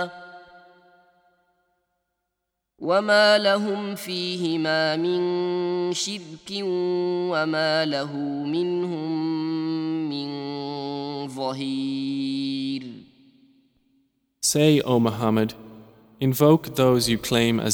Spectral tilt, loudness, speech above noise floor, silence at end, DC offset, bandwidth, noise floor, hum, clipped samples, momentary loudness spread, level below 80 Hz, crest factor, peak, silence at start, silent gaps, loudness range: -4.5 dB/octave; -23 LUFS; 58 dB; 0 s; under 0.1%; over 20 kHz; -81 dBFS; none; under 0.1%; 12 LU; -60 dBFS; 20 dB; -4 dBFS; 0 s; none; 7 LU